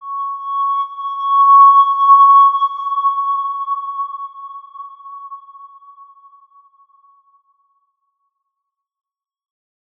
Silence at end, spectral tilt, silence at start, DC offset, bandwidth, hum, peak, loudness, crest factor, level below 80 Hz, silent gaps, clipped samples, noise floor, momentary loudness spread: 4.3 s; 1 dB/octave; 0 s; under 0.1%; 3.6 kHz; none; -2 dBFS; -12 LUFS; 16 dB; -90 dBFS; none; under 0.1%; -79 dBFS; 26 LU